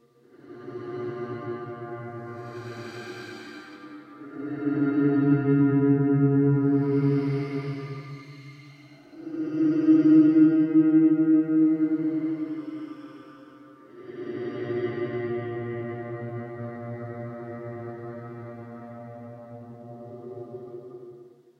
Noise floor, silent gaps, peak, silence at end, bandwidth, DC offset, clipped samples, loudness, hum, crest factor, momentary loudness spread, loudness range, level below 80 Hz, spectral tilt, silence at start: -53 dBFS; none; -8 dBFS; 0.35 s; 5.8 kHz; under 0.1%; under 0.1%; -24 LUFS; none; 18 dB; 23 LU; 18 LU; -72 dBFS; -10 dB/octave; 0.45 s